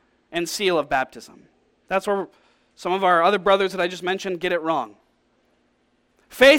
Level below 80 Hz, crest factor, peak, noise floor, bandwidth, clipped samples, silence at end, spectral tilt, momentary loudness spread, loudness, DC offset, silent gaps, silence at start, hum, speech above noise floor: -56 dBFS; 20 dB; -2 dBFS; -65 dBFS; 17 kHz; under 0.1%; 0 s; -3.5 dB/octave; 15 LU; -22 LUFS; under 0.1%; none; 0.3 s; none; 45 dB